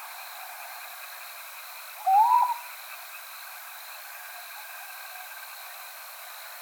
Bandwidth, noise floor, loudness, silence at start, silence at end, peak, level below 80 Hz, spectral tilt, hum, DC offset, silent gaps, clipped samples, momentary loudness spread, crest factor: over 20 kHz; -43 dBFS; -31 LUFS; 0 s; 0 s; -12 dBFS; under -90 dBFS; 7 dB/octave; none; under 0.1%; none; under 0.1%; 18 LU; 20 dB